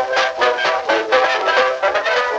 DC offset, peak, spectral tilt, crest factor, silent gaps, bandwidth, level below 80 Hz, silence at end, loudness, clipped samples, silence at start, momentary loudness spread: under 0.1%; -2 dBFS; -1.5 dB/octave; 14 dB; none; 8.4 kHz; -58 dBFS; 0 s; -16 LUFS; under 0.1%; 0 s; 3 LU